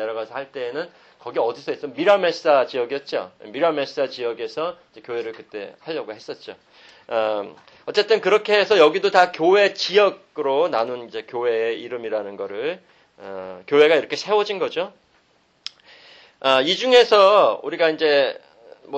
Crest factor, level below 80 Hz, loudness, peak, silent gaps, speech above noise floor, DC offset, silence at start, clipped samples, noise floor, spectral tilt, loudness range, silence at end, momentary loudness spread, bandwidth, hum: 20 dB; -72 dBFS; -20 LUFS; -2 dBFS; none; 41 dB; under 0.1%; 0 s; under 0.1%; -61 dBFS; -3.5 dB/octave; 9 LU; 0 s; 19 LU; 8.4 kHz; none